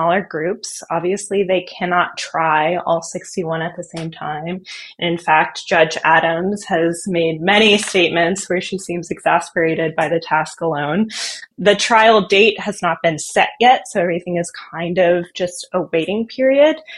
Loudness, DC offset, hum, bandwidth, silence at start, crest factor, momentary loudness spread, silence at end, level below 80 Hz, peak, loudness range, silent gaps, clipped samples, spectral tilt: -17 LUFS; under 0.1%; none; 12.5 kHz; 0 s; 18 dB; 12 LU; 0 s; -58 dBFS; 0 dBFS; 5 LU; none; under 0.1%; -4 dB/octave